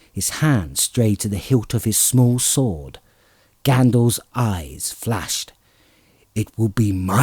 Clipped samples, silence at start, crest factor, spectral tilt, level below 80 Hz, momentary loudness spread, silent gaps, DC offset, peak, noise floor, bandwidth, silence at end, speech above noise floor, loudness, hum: under 0.1%; 0.15 s; 18 dB; -5 dB/octave; -44 dBFS; 11 LU; none; under 0.1%; -2 dBFS; -57 dBFS; over 20 kHz; 0 s; 38 dB; -19 LUFS; none